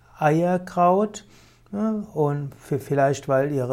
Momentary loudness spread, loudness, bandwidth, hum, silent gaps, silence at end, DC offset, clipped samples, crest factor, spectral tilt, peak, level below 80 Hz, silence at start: 10 LU; -23 LUFS; 16 kHz; none; none; 0 s; under 0.1%; under 0.1%; 16 dB; -7.5 dB/octave; -6 dBFS; -58 dBFS; 0.2 s